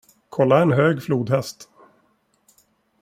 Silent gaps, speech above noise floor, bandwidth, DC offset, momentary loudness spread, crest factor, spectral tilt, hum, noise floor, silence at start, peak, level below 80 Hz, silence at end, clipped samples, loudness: none; 46 dB; 16 kHz; under 0.1%; 13 LU; 20 dB; -7 dB/octave; none; -64 dBFS; 0.3 s; -2 dBFS; -62 dBFS; 1.4 s; under 0.1%; -19 LUFS